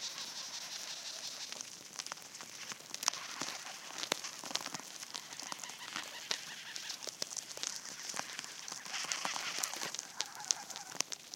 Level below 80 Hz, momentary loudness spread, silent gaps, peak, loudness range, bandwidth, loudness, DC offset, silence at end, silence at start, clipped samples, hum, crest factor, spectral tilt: -90 dBFS; 8 LU; none; -8 dBFS; 3 LU; 17 kHz; -40 LUFS; under 0.1%; 0 s; 0 s; under 0.1%; none; 36 dB; 1 dB/octave